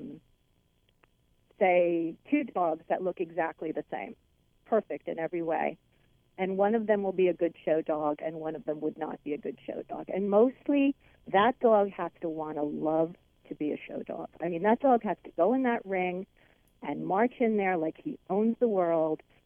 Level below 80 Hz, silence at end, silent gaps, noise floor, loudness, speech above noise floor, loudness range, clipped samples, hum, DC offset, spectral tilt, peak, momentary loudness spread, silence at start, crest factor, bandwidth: -68 dBFS; 0.3 s; none; -70 dBFS; -30 LUFS; 41 dB; 5 LU; under 0.1%; none; under 0.1%; -9 dB/octave; -12 dBFS; 13 LU; 0 s; 18 dB; 3.7 kHz